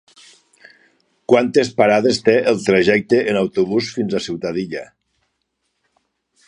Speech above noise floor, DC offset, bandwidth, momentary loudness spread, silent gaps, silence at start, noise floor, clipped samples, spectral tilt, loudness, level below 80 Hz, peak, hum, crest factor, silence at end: 56 dB; under 0.1%; 10.5 kHz; 9 LU; none; 1.3 s; -72 dBFS; under 0.1%; -5 dB/octave; -17 LUFS; -56 dBFS; 0 dBFS; none; 18 dB; 1.65 s